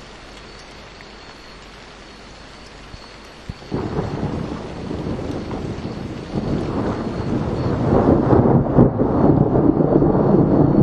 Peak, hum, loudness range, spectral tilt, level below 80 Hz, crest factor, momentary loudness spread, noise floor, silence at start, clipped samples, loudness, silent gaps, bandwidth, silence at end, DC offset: 0 dBFS; none; 20 LU; -9 dB/octave; -34 dBFS; 20 dB; 24 LU; -39 dBFS; 0 s; under 0.1%; -19 LUFS; none; 9.2 kHz; 0 s; under 0.1%